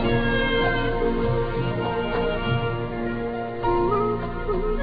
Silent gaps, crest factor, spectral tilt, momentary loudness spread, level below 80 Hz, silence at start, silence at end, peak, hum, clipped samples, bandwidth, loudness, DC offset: none; 14 dB; -9.5 dB/octave; 6 LU; -32 dBFS; 0 s; 0 s; -10 dBFS; none; under 0.1%; 5 kHz; -24 LUFS; under 0.1%